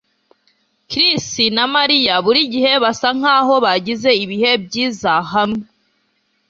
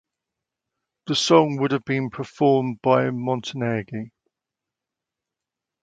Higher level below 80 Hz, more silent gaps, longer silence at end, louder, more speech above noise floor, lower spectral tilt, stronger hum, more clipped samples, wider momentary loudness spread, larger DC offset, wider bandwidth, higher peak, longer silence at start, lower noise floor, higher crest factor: first, -56 dBFS vs -64 dBFS; neither; second, 0.85 s vs 1.75 s; first, -14 LUFS vs -22 LUFS; second, 49 dB vs 65 dB; second, -3 dB/octave vs -5.5 dB/octave; neither; neither; second, 6 LU vs 16 LU; neither; second, 7.8 kHz vs 9.4 kHz; about the same, -2 dBFS vs -2 dBFS; second, 0.9 s vs 1.05 s; second, -64 dBFS vs -86 dBFS; second, 16 dB vs 22 dB